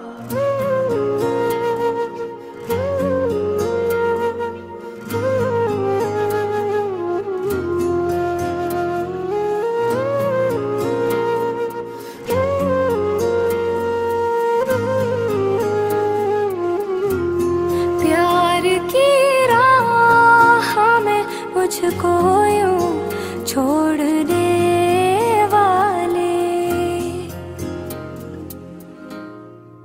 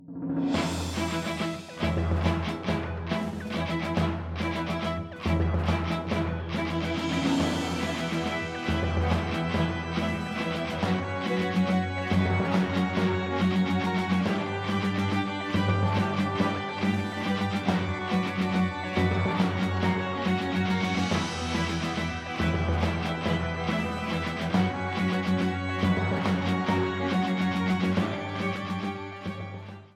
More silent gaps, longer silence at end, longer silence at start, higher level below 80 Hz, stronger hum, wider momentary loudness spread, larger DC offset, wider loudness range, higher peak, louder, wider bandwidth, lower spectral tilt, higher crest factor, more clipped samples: neither; about the same, 0.05 s vs 0.1 s; about the same, 0 s vs 0 s; second, -50 dBFS vs -44 dBFS; neither; first, 14 LU vs 5 LU; neither; first, 7 LU vs 3 LU; first, 0 dBFS vs -12 dBFS; first, -18 LUFS vs -28 LUFS; first, 16 kHz vs 13 kHz; about the same, -5.5 dB/octave vs -6.5 dB/octave; about the same, 18 dB vs 16 dB; neither